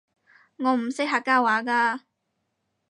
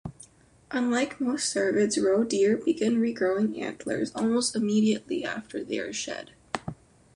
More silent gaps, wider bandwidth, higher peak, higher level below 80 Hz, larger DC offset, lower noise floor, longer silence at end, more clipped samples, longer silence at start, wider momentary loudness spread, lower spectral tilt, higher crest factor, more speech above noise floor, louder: neither; about the same, 11 kHz vs 11.5 kHz; about the same, -8 dBFS vs -8 dBFS; second, -84 dBFS vs -62 dBFS; neither; first, -77 dBFS vs -54 dBFS; first, 0.9 s vs 0.4 s; neither; first, 0.6 s vs 0.05 s; second, 6 LU vs 12 LU; about the same, -3.5 dB/octave vs -4 dB/octave; about the same, 18 dB vs 18 dB; first, 54 dB vs 28 dB; first, -23 LUFS vs -27 LUFS